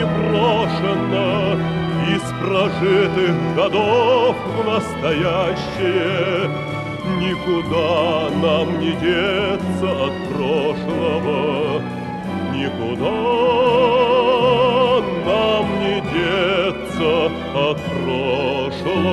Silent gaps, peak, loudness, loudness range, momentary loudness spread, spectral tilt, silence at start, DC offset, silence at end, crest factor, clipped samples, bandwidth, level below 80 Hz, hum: none; -4 dBFS; -18 LUFS; 4 LU; 7 LU; -6.5 dB/octave; 0 s; under 0.1%; 0 s; 14 dB; under 0.1%; 12.5 kHz; -44 dBFS; none